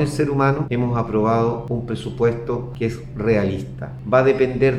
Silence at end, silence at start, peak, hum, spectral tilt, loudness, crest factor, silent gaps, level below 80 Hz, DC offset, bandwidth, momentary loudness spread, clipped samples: 0 s; 0 s; -2 dBFS; none; -8 dB/octave; -20 LUFS; 18 dB; none; -42 dBFS; under 0.1%; 12 kHz; 9 LU; under 0.1%